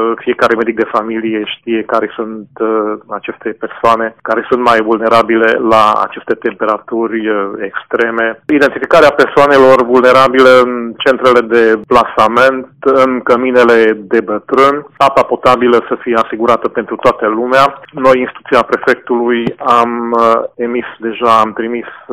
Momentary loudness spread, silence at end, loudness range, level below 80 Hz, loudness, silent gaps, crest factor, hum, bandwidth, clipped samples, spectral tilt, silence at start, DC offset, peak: 10 LU; 0 s; 6 LU; -48 dBFS; -11 LUFS; none; 10 dB; none; 15 kHz; 1%; -5.5 dB/octave; 0 s; under 0.1%; 0 dBFS